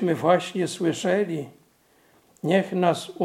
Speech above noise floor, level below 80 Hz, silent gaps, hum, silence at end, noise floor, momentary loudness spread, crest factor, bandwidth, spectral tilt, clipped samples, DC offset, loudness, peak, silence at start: 38 dB; -74 dBFS; none; none; 0 s; -61 dBFS; 11 LU; 18 dB; 15.5 kHz; -5.5 dB/octave; under 0.1%; under 0.1%; -24 LUFS; -6 dBFS; 0 s